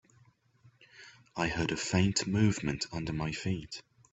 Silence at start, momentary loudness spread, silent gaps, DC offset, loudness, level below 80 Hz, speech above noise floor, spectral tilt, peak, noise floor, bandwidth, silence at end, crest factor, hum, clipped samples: 0.95 s; 17 LU; none; under 0.1%; -32 LUFS; -54 dBFS; 34 dB; -5 dB/octave; -14 dBFS; -65 dBFS; 8.4 kHz; 0.3 s; 20 dB; none; under 0.1%